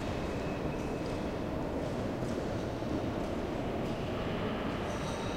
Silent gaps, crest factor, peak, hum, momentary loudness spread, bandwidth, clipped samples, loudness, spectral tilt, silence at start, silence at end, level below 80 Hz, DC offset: none; 12 dB; -22 dBFS; none; 1 LU; 16.5 kHz; under 0.1%; -36 LUFS; -6.5 dB/octave; 0 s; 0 s; -46 dBFS; under 0.1%